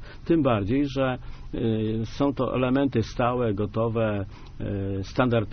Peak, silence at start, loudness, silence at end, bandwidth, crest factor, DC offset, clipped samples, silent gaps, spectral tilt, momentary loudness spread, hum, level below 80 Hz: -8 dBFS; 0 s; -26 LUFS; 0 s; 6.6 kHz; 18 dB; under 0.1%; under 0.1%; none; -6.5 dB/octave; 9 LU; none; -42 dBFS